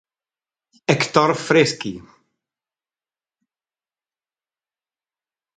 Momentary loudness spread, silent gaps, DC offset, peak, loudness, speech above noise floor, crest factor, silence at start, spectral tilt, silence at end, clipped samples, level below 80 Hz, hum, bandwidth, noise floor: 14 LU; none; under 0.1%; 0 dBFS; -18 LUFS; over 72 dB; 24 dB; 0.9 s; -4.5 dB/octave; 3.55 s; under 0.1%; -64 dBFS; none; 9.4 kHz; under -90 dBFS